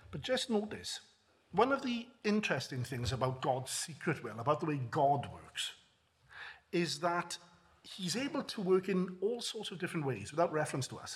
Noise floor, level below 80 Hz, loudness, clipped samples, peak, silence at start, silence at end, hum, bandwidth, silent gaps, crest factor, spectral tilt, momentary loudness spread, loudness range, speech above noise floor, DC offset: -69 dBFS; -68 dBFS; -36 LUFS; under 0.1%; -14 dBFS; 0.1 s; 0 s; none; 15 kHz; none; 22 dB; -4.5 dB/octave; 10 LU; 2 LU; 34 dB; under 0.1%